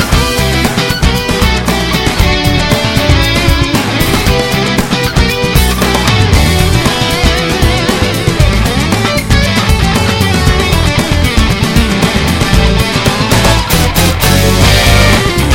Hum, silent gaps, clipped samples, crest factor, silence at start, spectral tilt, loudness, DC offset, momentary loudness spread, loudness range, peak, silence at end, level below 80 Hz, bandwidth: none; none; 2%; 10 dB; 0 s; -4.5 dB/octave; -10 LUFS; 0.3%; 3 LU; 1 LU; 0 dBFS; 0 s; -16 dBFS; over 20 kHz